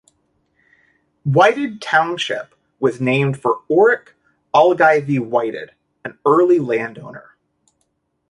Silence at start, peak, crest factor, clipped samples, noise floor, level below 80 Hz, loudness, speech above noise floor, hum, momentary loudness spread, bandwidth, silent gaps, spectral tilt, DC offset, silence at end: 1.25 s; -2 dBFS; 16 dB; under 0.1%; -69 dBFS; -62 dBFS; -17 LUFS; 53 dB; none; 16 LU; 11 kHz; none; -6.5 dB/octave; under 0.1%; 1.1 s